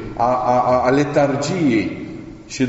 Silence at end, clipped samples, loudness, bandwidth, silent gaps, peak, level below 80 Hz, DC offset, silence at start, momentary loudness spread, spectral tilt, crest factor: 0 s; under 0.1%; -17 LUFS; 8 kHz; none; -4 dBFS; -44 dBFS; under 0.1%; 0 s; 16 LU; -5.5 dB/octave; 14 dB